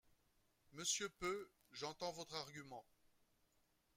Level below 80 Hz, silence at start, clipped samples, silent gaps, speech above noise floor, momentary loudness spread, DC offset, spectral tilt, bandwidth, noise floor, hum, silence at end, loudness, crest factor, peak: -78 dBFS; 0.7 s; under 0.1%; none; 33 dB; 16 LU; under 0.1%; -1.5 dB/octave; 16 kHz; -81 dBFS; none; 1.15 s; -46 LUFS; 22 dB; -28 dBFS